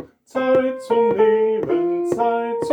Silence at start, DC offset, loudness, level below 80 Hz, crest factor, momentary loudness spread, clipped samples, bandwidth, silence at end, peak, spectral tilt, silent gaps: 0 s; under 0.1%; -19 LUFS; -60 dBFS; 14 dB; 6 LU; under 0.1%; 10 kHz; 0 s; -6 dBFS; -6.5 dB/octave; none